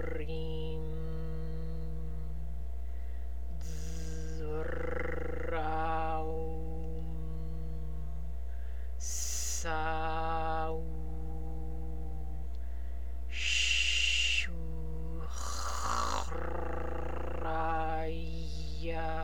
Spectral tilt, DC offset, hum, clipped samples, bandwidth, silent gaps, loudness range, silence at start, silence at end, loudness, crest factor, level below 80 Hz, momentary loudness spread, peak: -3.5 dB/octave; 2%; none; under 0.1%; 17 kHz; none; 9 LU; 0 s; 0 s; -36 LUFS; 20 dB; -40 dBFS; 12 LU; -18 dBFS